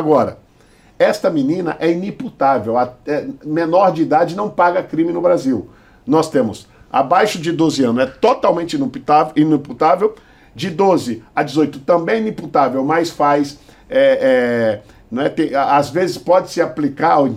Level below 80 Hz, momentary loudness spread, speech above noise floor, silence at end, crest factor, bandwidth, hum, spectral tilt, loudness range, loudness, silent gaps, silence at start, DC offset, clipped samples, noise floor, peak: -52 dBFS; 8 LU; 33 dB; 0 s; 16 dB; 15 kHz; none; -6 dB/octave; 2 LU; -16 LUFS; none; 0 s; under 0.1%; under 0.1%; -49 dBFS; 0 dBFS